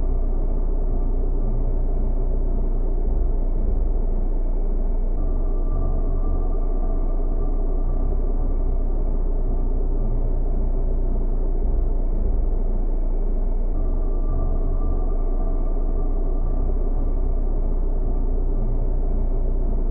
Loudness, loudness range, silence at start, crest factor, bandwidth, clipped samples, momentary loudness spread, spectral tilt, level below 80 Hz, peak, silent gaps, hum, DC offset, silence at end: -27 LUFS; 0 LU; 0 s; 8 dB; 1.4 kHz; under 0.1%; 1 LU; -15 dB/octave; -20 dBFS; -10 dBFS; none; none; under 0.1%; 0 s